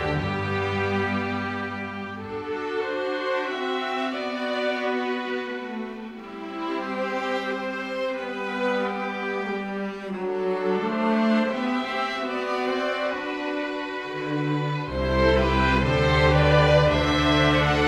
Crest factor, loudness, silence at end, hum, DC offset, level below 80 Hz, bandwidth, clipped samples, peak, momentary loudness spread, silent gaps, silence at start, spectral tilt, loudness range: 18 dB; -25 LUFS; 0 s; none; under 0.1%; -38 dBFS; 12 kHz; under 0.1%; -6 dBFS; 12 LU; none; 0 s; -6.5 dB/octave; 8 LU